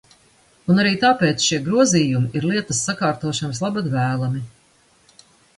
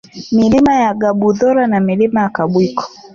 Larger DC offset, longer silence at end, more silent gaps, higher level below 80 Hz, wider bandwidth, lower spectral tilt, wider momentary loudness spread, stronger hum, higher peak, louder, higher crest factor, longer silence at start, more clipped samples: neither; first, 1.1 s vs 0.25 s; neither; second, -56 dBFS vs -46 dBFS; first, 11.5 kHz vs 7.4 kHz; second, -4.5 dB/octave vs -7 dB/octave; about the same, 8 LU vs 6 LU; neither; about the same, -4 dBFS vs -2 dBFS; second, -19 LUFS vs -13 LUFS; first, 18 dB vs 10 dB; first, 0.65 s vs 0.15 s; neither